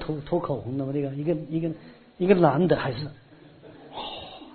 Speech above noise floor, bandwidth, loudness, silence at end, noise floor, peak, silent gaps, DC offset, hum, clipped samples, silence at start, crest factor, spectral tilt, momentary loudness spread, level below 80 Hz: 24 dB; 4.5 kHz; -26 LUFS; 0 s; -49 dBFS; -4 dBFS; none; under 0.1%; none; under 0.1%; 0 s; 22 dB; -11.5 dB/octave; 18 LU; -54 dBFS